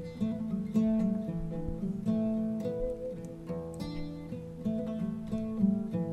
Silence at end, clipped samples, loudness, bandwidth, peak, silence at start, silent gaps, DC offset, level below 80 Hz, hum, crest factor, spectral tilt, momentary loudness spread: 0 s; under 0.1%; -34 LUFS; 10.5 kHz; -18 dBFS; 0 s; none; under 0.1%; -48 dBFS; none; 16 dB; -9 dB/octave; 10 LU